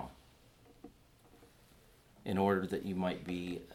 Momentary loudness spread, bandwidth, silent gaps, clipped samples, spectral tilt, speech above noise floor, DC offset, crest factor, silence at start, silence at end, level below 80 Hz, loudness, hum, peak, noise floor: 26 LU; 16 kHz; none; under 0.1%; -7 dB/octave; 28 dB; under 0.1%; 22 dB; 0 s; 0 s; -66 dBFS; -36 LUFS; none; -18 dBFS; -63 dBFS